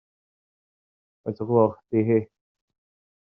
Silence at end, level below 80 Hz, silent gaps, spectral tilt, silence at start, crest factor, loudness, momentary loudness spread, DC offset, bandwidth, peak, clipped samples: 0.95 s; -68 dBFS; none; -10.5 dB/octave; 1.25 s; 22 dB; -23 LUFS; 15 LU; under 0.1%; 5.2 kHz; -6 dBFS; under 0.1%